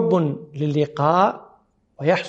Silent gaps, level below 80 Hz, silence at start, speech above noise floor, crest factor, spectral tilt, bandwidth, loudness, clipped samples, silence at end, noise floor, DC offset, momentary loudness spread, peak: none; -64 dBFS; 0 s; 38 dB; 18 dB; -7.5 dB/octave; 8 kHz; -21 LUFS; under 0.1%; 0 s; -57 dBFS; under 0.1%; 9 LU; -4 dBFS